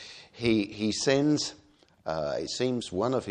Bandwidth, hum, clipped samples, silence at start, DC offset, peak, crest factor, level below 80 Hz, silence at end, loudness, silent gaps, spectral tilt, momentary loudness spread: 10 kHz; none; under 0.1%; 0 s; under 0.1%; -10 dBFS; 18 dB; -58 dBFS; 0 s; -28 LUFS; none; -4.5 dB/octave; 10 LU